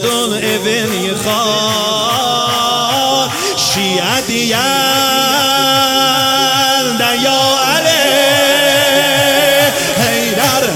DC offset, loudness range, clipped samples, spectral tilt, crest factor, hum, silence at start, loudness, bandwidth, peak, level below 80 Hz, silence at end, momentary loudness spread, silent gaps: under 0.1%; 3 LU; under 0.1%; -2 dB/octave; 12 dB; none; 0 s; -11 LUFS; 17 kHz; 0 dBFS; -48 dBFS; 0 s; 5 LU; none